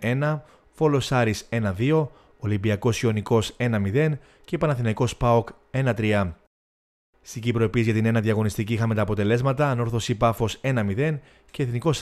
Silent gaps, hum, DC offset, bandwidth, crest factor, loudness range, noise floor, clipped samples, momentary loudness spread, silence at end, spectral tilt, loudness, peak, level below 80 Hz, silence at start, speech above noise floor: 6.47-7.13 s; none; under 0.1%; 14 kHz; 16 dB; 2 LU; under -90 dBFS; under 0.1%; 8 LU; 0 s; -6.5 dB/octave; -24 LUFS; -8 dBFS; -48 dBFS; 0 s; over 67 dB